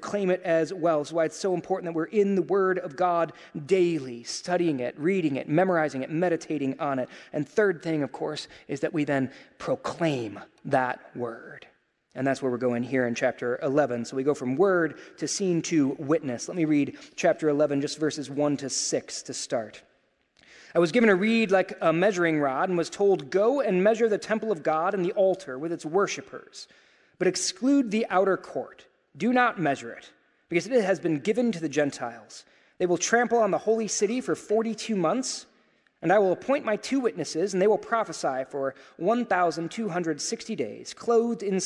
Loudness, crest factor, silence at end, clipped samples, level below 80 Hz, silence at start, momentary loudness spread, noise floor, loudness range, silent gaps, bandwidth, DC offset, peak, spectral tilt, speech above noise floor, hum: -26 LUFS; 20 dB; 0 s; under 0.1%; -74 dBFS; 0 s; 11 LU; -68 dBFS; 5 LU; none; 11.5 kHz; under 0.1%; -8 dBFS; -5 dB/octave; 42 dB; none